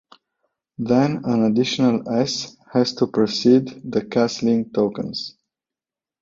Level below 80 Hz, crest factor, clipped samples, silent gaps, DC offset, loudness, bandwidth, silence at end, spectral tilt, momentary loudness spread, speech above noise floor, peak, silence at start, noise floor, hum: -60 dBFS; 18 dB; under 0.1%; none; under 0.1%; -20 LUFS; 7.6 kHz; 0.95 s; -5.5 dB/octave; 10 LU; 70 dB; -4 dBFS; 0.8 s; -90 dBFS; none